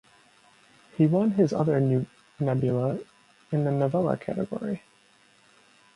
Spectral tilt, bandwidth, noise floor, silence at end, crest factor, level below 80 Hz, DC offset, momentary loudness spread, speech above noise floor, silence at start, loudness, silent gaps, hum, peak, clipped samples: -9.5 dB/octave; 11 kHz; -60 dBFS; 1.2 s; 18 dB; -64 dBFS; under 0.1%; 12 LU; 36 dB; 1 s; -26 LUFS; none; none; -8 dBFS; under 0.1%